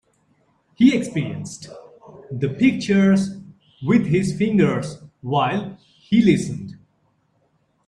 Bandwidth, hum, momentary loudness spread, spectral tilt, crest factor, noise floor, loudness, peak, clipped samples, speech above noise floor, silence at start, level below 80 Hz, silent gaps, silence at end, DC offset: 11 kHz; none; 18 LU; -6.5 dB/octave; 18 dB; -65 dBFS; -20 LUFS; -4 dBFS; under 0.1%; 46 dB; 0.8 s; -54 dBFS; none; 1.15 s; under 0.1%